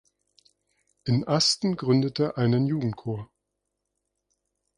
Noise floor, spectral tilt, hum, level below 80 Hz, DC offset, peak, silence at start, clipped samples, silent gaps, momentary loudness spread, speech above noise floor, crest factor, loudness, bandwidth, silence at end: -81 dBFS; -5.5 dB/octave; 50 Hz at -55 dBFS; -62 dBFS; under 0.1%; -10 dBFS; 1.05 s; under 0.1%; none; 13 LU; 57 dB; 18 dB; -25 LUFS; 11 kHz; 1.55 s